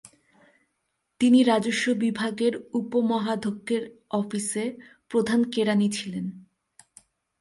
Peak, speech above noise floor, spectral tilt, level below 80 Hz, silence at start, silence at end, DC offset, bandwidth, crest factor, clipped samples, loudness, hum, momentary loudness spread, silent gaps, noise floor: -8 dBFS; 53 dB; -5 dB/octave; -70 dBFS; 1.2 s; 1 s; under 0.1%; 11.5 kHz; 18 dB; under 0.1%; -25 LUFS; none; 11 LU; none; -77 dBFS